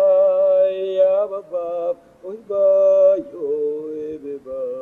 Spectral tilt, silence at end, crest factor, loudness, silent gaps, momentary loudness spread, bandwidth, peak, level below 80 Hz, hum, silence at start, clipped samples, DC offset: -7 dB/octave; 0 s; 12 dB; -18 LUFS; none; 16 LU; 4 kHz; -6 dBFS; -66 dBFS; none; 0 s; under 0.1%; under 0.1%